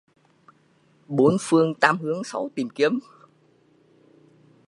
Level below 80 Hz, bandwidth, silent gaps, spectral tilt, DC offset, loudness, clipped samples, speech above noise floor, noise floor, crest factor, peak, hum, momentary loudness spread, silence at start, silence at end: -66 dBFS; 11.5 kHz; none; -5.5 dB/octave; under 0.1%; -22 LUFS; under 0.1%; 39 dB; -61 dBFS; 24 dB; 0 dBFS; none; 11 LU; 1.1 s; 1.65 s